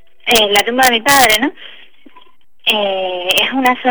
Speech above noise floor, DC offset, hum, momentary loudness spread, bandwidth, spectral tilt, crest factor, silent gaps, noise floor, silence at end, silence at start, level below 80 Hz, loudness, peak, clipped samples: 35 dB; 1%; none; 9 LU; over 20 kHz; -1 dB/octave; 14 dB; none; -48 dBFS; 0 s; 0.25 s; -46 dBFS; -12 LUFS; 0 dBFS; under 0.1%